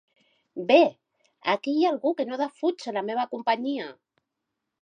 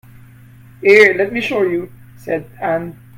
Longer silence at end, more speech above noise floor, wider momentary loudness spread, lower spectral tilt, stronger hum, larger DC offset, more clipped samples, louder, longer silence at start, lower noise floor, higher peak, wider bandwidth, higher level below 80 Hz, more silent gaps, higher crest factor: first, 0.9 s vs 0.25 s; first, 58 dB vs 27 dB; about the same, 14 LU vs 15 LU; about the same, -5 dB/octave vs -5.5 dB/octave; neither; neither; neither; second, -25 LUFS vs -15 LUFS; second, 0.55 s vs 0.8 s; first, -83 dBFS vs -42 dBFS; second, -6 dBFS vs 0 dBFS; second, 9.6 kHz vs 15.5 kHz; second, -84 dBFS vs -54 dBFS; neither; first, 22 dB vs 16 dB